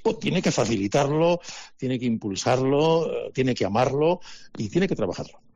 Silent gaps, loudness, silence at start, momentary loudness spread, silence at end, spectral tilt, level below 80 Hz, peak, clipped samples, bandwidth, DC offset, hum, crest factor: none; -24 LUFS; 0 s; 10 LU; 0.2 s; -5.5 dB/octave; -54 dBFS; -10 dBFS; under 0.1%; 10 kHz; under 0.1%; none; 12 dB